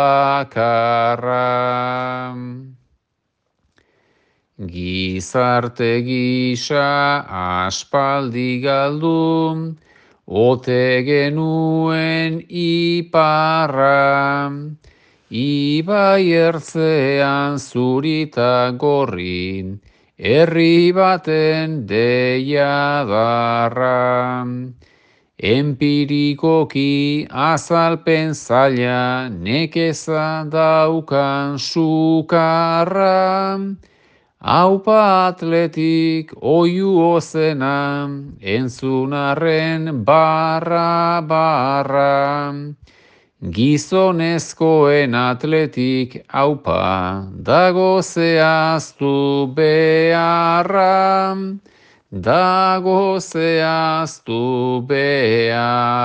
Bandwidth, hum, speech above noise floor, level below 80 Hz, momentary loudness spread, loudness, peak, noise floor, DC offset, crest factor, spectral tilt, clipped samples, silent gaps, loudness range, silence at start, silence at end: 9.6 kHz; none; 56 dB; -58 dBFS; 9 LU; -16 LUFS; 0 dBFS; -72 dBFS; under 0.1%; 16 dB; -6 dB/octave; under 0.1%; none; 3 LU; 0 s; 0 s